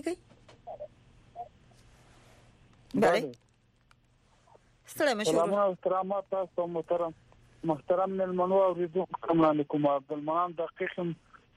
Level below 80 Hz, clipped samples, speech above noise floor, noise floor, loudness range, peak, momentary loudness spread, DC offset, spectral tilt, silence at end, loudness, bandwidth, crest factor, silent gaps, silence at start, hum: -66 dBFS; under 0.1%; 37 dB; -65 dBFS; 6 LU; -16 dBFS; 20 LU; under 0.1%; -6 dB/octave; 0.4 s; -30 LUFS; 14.5 kHz; 16 dB; none; 0.05 s; none